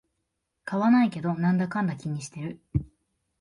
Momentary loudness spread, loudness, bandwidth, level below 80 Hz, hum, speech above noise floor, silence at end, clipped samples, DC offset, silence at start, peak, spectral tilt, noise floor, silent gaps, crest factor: 14 LU; -26 LUFS; 11 kHz; -50 dBFS; none; 54 dB; 0.55 s; under 0.1%; under 0.1%; 0.65 s; -12 dBFS; -7.5 dB/octave; -80 dBFS; none; 16 dB